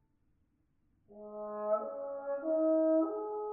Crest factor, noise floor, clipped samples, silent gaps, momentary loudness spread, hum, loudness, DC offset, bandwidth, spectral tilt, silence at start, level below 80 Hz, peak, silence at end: 14 dB; -74 dBFS; under 0.1%; none; 16 LU; none; -33 LUFS; under 0.1%; 1.8 kHz; -3 dB/octave; 1.1 s; -78 dBFS; -20 dBFS; 0 s